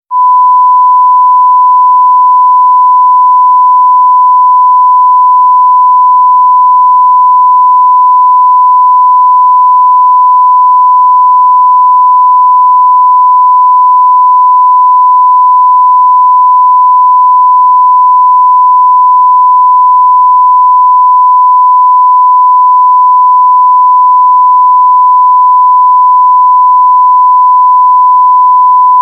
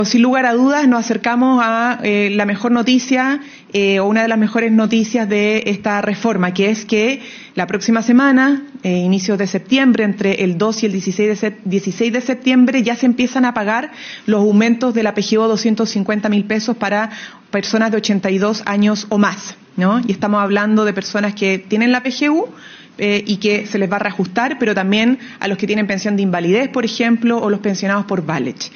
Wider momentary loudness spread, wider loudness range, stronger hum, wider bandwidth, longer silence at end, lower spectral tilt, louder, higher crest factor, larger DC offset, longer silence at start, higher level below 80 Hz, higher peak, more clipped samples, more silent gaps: second, 0 LU vs 7 LU; about the same, 0 LU vs 2 LU; neither; second, 1.1 kHz vs 6.8 kHz; about the same, 0 s vs 0.05 s; about the same, -4 dB/octave vs -4.5 dB/octave; first, -4 LUFS vs -16 LUFS; second, 4 dB vs 14 dB; neither; about the same, 0.1 s vs 0 s; second, under -90 dBFS vs -62 dBFS; about the same, 0 dBFS vs 0 dBFS; neither; neither